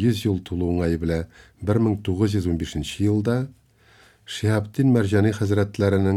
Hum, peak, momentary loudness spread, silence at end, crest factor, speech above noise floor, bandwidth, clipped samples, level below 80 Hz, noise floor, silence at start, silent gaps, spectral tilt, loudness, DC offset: none; -6 dBFS; 8 LU; 0 s; 16 dB; 33 dB; 13.5 kHz; under 0.1%; -42 dBFS; -55 dBFS; 0 s; none; -7 dB/octave; -23 LUFS; under 0.1%